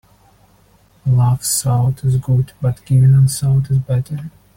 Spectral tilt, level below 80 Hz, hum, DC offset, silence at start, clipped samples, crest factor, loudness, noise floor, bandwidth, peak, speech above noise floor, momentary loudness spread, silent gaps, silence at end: -6 dB/octave; -42 dBFS; none; under 0.1%; 1.05 s; under 0.1%; 12 dB; -16 LUFS; -52 dBFS; 16.5 kHz; -4 dBFS; 37 dB; 10 LU; none; 0.25 s